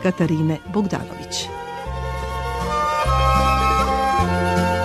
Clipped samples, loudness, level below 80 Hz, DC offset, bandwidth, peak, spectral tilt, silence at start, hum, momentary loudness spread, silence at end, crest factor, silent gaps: under 0.1%; -21 LUFS; -30 dBFS; under 0.1%; 13.5 kHz; -4 dBFS; -5.5 dB/octave; 0 s; none; 11 LU; 0 s; 16 dB; none